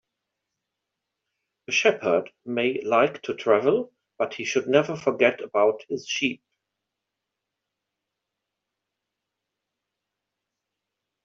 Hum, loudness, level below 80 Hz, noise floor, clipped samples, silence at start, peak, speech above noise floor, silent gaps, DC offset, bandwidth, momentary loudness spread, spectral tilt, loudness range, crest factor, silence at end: none; -24 LUFS; -74 dBFS; -84 dBFS; under 0.1%; 1.7 s; -6 dBFS; 61 dB; none; under 0.1%; 7.6 kHz; 9 LU; -2.5 dB/octave; 7 LU; 22 dB; 4.9 s